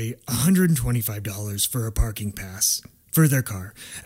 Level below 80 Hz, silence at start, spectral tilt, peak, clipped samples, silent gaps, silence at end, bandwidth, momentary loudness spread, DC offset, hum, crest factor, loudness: -36 dBFS; 0 s; -4.5 dB/octave; -6 dBFS; under 0.1%; none; 0.05 s; 16.5 kHz; 12 LU; under 0.1%; none; 16 dB; -23 LUFS